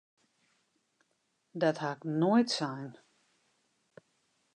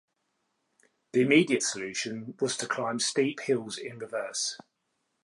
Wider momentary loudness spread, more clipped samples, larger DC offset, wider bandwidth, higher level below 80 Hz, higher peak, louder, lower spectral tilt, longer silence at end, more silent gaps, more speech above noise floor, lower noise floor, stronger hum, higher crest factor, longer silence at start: first, 18 LU vs 13 LU; neither; neither; second, 10 kHz vs 11.5 kHz; second, -88 dBFS vs -78 dBFS; second, -14 dBFS vs -8 dBFS; about the same, -31 LUFS vs -29 LUFS; first, -5.5 dB/octave vs -3.5 dB/octave; first, 1.65 s vs 0.65 s; neither; about the same, 48 dB vs 50 dB; about the same, -78 dBFS vs -79 dBFS; neither; about the same, 20 dB vs 22 dB; first, 1.55 s vs 1.15 s